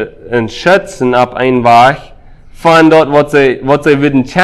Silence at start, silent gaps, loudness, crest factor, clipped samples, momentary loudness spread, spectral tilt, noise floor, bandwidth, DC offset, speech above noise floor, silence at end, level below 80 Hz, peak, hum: 0 s; none; -9 LUFS; 8 dB; 2%; 9 LU; -6 dB/octave; -33 dBFS; 13 kHz; under 0.1%; 25 dB; 0 s; -40 dBFS; 0 dBFS; none